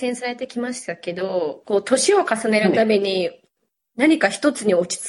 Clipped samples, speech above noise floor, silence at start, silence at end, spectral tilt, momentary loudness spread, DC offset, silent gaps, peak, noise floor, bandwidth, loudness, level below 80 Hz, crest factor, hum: under 0.1%; 53 dB; 0 s; 0 s; -4 dB/octave; 11 LU; under 0.1%; none; -4 dBFS; -73 dBFS; 11.5 kHz; -20 LUFS; -68 dBFS; 16 dB; none